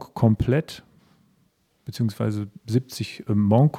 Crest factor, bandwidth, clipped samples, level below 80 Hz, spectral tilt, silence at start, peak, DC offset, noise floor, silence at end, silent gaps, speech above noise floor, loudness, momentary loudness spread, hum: 18 dB; 15.5 kHz; under 0.1%; -50 dBFS; -8 dB/octave; 0 s; -4 dBFS; under 0.1%; -66 dBFS; 0 s; none; 44 dB; -24 LUFS; 19 LU; none